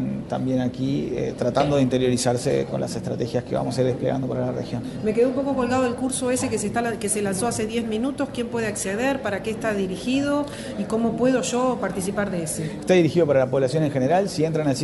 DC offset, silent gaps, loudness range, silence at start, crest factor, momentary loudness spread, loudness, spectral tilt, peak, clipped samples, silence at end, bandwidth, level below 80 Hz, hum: under 0.1%; none; 3 LU; 0 s; 16 dB; 7 LU; -23 LUFS; -5.5 dB/octave; -6 dBFS; under 0.1%; 0 s; 12 kHz; -50 dBFS; none